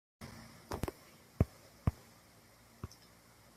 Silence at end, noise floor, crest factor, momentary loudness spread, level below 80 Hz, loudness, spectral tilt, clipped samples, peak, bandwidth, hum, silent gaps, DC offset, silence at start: 0.7 s; -62 dBFS; 28 dB; 24 LU; -50 dBFS; -42 LUFS; -7 dB/octave; under 0.1%; -16 dBFS; 15.5 kHz; none; none; under 0.1%; 0.2 s